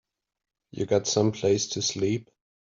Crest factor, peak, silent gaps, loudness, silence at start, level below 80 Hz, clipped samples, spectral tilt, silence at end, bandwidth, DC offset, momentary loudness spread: 20 dB; -8 dBFS; none; -26 LUFS; 0.75 s; -64 dBFS; under 0.1%; -4.5 dB/octave; 0.5 s; 7.6 kHz; under 0.1%; 10 LU